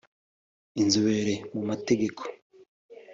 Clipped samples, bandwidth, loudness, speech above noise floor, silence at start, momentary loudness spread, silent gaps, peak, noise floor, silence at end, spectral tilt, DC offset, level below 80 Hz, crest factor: under 0.1%; 7.8 kHz; -27 LUFS; over 64 dB; 0.75 s; 16 LU; 2.42-2.50 s, 2.68-2.89 s; -10 dBFS; under -90 dBFS; 0 s; -4.5 dB/octave; under 0.1%; -66 dBFS; 20 dB